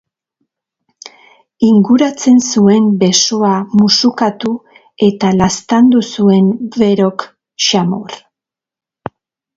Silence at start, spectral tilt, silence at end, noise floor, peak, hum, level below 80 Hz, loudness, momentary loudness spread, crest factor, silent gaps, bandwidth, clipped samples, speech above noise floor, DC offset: 1.6 s; -5 dB/octave; 1.4 s; -85 dBFS; 0 dBFS; none; -48 dBFS; -11 LUFS; 16 LU; 12 dB; none; 7.8 kHz; under 0.1%; 75 dB; under 0.1%